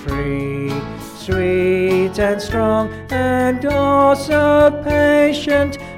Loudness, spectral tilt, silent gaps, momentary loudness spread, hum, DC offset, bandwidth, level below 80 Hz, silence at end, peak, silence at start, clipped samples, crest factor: -16 LUFS; -6.5 dB/octave; none; 9 LU; none; under 0.1%; 16 kHz; -36 dBFS; 0 s; -2 dBFS; 0 s; under 0.1%; 14 dB